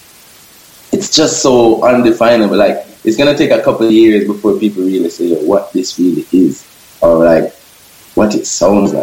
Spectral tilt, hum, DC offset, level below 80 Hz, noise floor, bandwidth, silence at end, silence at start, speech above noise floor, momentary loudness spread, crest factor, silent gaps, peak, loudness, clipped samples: -4.5 dB/octave; none; under 0.1%; -44 dBFS; -40 dBFS; 16.5 kHz; 0 s; 0.9 s; 31 dB; 7 LU; 10 dB; none; 0 dBFS; -11 LUFS; 0.2%